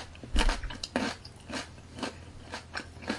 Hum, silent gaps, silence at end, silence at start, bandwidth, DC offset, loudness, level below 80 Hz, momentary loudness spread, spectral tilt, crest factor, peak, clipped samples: none; none; 0 s; 0 s; 11.5 kHz; under 0.1%; -36 LUFS; -36 dBFS; 13 LU; -4 dB/octave; 24 dB; -10 dBFS; under 0.1%